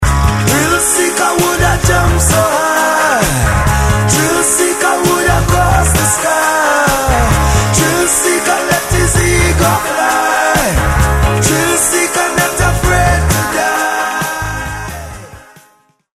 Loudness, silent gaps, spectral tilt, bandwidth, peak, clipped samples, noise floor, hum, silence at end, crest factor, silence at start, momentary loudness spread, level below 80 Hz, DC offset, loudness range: -11 LUFS; none; -3.5 dB/octave; 16 kHz; 0 dBFS; under 0.1%; -51 dBFS; none; 0.7 s; 12 dB; 0 s; 3 LU; -20 dBFS; 0.4%; 2 LU